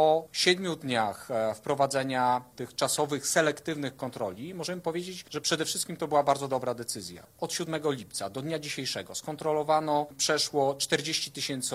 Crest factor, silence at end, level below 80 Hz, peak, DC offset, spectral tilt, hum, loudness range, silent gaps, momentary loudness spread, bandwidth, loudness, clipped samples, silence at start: 20 dB; 0 s; -70 dBFS; -10 dBFS; under 0.1%; -3 dB/octave; none; 3 LU; none; 10 LU; 16 kHz; -29 LUFS; under 0.1%; 0 s